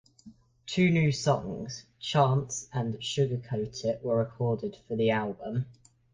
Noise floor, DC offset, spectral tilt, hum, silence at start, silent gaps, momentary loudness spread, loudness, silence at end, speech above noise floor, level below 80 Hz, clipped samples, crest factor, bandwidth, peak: -55 dBFS; under 0.1%; -5.5 dB/octave; none; 0.25 s; none; 11 LU; -29 LUFS; 0.4 s; 26 dB; -60 dBFS; under 0.1%; 18 dB; 9.8 kHz; -12 dBFS